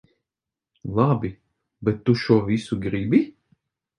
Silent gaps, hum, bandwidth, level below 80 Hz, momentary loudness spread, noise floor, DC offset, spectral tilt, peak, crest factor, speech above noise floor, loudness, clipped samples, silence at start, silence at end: none; none; 10.5 kHz; -52 dBFS; 11 LU; -88 dBFS; under 0.1%; -8 dB/octave; -4 dBFS; 20 dB; 67 dB; -23 LUFS; under 0.1%; 0.85 s; 0.7 s